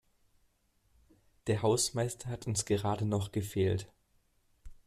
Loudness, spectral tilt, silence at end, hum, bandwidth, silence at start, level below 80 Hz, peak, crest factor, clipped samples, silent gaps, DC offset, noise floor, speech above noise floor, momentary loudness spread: -33 LUFS; -5 dB/octave; 0.15 s; none; 14.5 kHz; 1.45 s; -60 dBFS; -18 dBFS; 18 dB; under 0.1%; none; under 0.1%; -72 dBFS; 40 dB; 9 LU